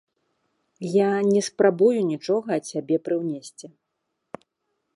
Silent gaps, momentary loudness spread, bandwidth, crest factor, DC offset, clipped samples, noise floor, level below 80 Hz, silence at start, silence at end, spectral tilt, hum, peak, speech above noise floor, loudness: none; 21 LU; 11.5 kHz; 18 dB; under 0.1%; under 0.1%; -78 dBFS; -76 dBFS; 0.8 s; 1.3 s; -6 dB/octave; none; -6 dBFS; 56 dB; -23 LUFS